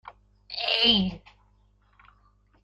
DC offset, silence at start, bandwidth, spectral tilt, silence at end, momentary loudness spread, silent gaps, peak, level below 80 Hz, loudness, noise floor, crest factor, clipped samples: under 0.1%; 0.05 s; 10 kHz; -5.5 dB/octave; 1.45 s; 19 LU; none; -8 dBFS; -54 dBFS; -22 LUFS; -63 dBFS; 22 dB; under 0.1%